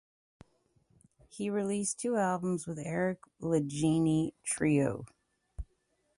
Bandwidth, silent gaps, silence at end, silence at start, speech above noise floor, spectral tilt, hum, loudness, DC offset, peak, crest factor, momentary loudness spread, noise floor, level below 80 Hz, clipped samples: 11.5 kHz; none; 0.55 s; 1.35 s; 44 dB; -6 dB/octave; none; -32 LUFS; under 0.1%; -16 dBFS; 16 dB; 19 LU; -76 dBFS; -56 dBFS; under 0.1%